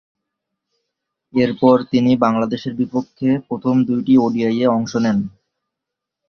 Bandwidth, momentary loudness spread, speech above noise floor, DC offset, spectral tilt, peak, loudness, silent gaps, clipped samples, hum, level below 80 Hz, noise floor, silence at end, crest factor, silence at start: 6.6 kHz; 8 LU; 66 dB; under 0.1%; -7.5 dB/octave; -2 dBFS; -17 LUFS; none; under 0.1%; none; -56 dBFS; -82 dBFS; 1 s; 16 dB; 1.35 s